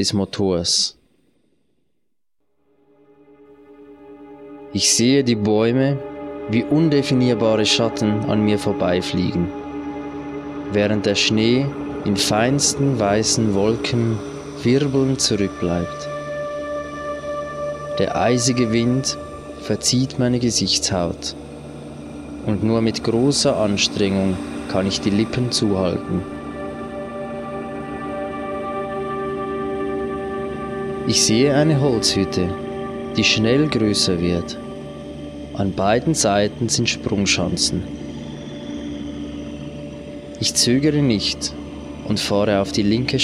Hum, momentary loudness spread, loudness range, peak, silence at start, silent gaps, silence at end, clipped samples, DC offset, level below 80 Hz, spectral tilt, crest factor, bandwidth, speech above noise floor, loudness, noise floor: none; 15 LU; 7 LU; -4 dBFS; 0 s; none; 0 s; under 0.1%; under 0.1%; -44 dBFS; -4.5 dB/octave; 18 dB; 14 kHz; 59 dB; -20 LUFS; -77 dBFS